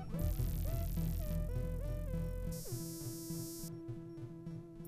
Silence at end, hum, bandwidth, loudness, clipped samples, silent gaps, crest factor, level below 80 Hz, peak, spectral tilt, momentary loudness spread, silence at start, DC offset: 0 s; none; 15.5 kHz; -42 LUFS; under 0.1%; none; 14 dB; -44 dBFS; -26 dBFS; -6.5 dB/octave; 9 LU; 0 s; under 0.1%